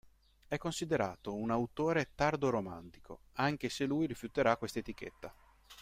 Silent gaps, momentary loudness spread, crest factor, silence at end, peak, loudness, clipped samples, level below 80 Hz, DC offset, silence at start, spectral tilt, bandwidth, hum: none; 15 LU; 22 dB; 0 s; -14 dBFS; -35 LUFS; under 0.1%; -62 dBFS; under 0.1%; 0.5 s; -5.5 dB/octave; 16 kHz; none